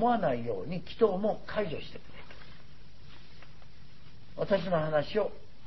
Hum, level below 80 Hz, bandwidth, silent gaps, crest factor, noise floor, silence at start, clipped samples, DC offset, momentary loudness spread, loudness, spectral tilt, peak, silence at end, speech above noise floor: none; -56 dBFS; 6 kHz; none; 20 dB; -54 dBFS; 0 s; under 0.1%; 1%; 23 LU; -31 LUFS; -5 dB/octave; -14 dBFS; 0 s; 24 dB